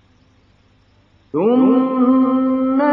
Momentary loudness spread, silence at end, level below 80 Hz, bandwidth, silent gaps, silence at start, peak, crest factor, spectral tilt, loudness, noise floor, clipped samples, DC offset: 5 LU; 0 s; -58 dBFS; 3.6 kHz; none; 1.35 s; -4 dBFS; 12 dB; -10 dB/octave; -15 LUFS; -54 dBFS; under 0.1%; under 0.1%